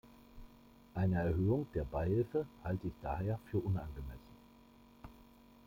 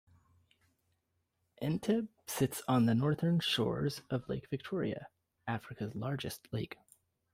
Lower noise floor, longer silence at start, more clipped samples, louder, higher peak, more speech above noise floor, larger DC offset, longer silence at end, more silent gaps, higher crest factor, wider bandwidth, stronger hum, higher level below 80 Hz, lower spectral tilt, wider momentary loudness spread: second, -62 dBFS vs -81 dBFS; second, 0.05 s vs 1.6 s; neither; second, -38 LUFS vs -35 LUFS; second, -24 dBFS vs -20 dBFS; second, 26 dB vs 47 dB; neither; second, 0.4 s vs 0.6 s; neither; about the same, 16 dB vs 18 dB; about the same, 16 kHz vs 16 kHz; neither; first, -52 dBFS vs -66 dBFS; first, -10 dB/octave vs -6 dB/octave; first, 22 LU vs 11 LU